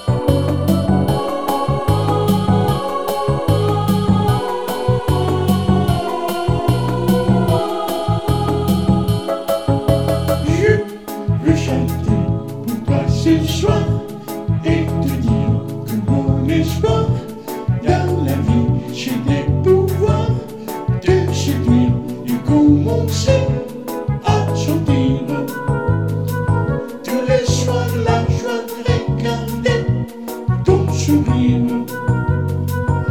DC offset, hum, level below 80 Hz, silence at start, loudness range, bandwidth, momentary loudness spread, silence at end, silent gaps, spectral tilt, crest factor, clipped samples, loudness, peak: 0.6%; none; -32 dBFS; 0 s; 2 LU; 18 kHz; 6 LU; 0 s; none; -7 dB/octave; 16 dB; under 0.1%; -17 LUFS; 0 dBFS